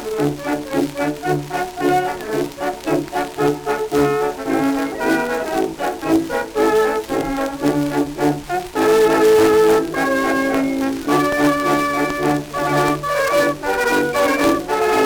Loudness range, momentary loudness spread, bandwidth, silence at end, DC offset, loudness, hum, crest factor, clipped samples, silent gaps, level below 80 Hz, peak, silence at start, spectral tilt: 4 LU; 8 LU; over 20 kHz; 0 s; under 0.1%; -18 LUFS; none; 16 dB; under 0.1%; none; -44 dBFS; -2 dBFS; 0 s; -5 dB/octave